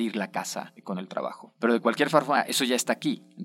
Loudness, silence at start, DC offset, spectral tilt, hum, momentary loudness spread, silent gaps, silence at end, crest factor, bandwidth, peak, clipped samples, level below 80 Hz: -27 LUFS; 0 s; under 0.1%; -3.5 dB/octave; none; 13 LU; none; 0 s; 22 dB; 16.5 kHz; -4 dBFS; under 0.1%; -80 dBFS